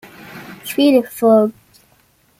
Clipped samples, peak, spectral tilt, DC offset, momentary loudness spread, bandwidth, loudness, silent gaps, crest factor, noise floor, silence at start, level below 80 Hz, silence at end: under 0.1%; -2 dBFS; -5.5 dB/octave; under 0.1%; 22 LU; 16.5 kHz; -15 LUFS; none; 16 dB; -56 dBFS; 0.3 s; -62 dBFS; 0.9 s